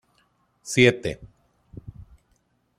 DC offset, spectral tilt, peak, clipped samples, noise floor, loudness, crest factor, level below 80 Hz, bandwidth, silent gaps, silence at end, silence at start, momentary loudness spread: under 0.1%; -4.5 dB/octave; -2 dBFS; under 0.1%; -68 dBFS; -21 LUFS; 26 dB; -54 dBFS; 14 kHz; none; 1.55 s; 0.65 s; 26 LU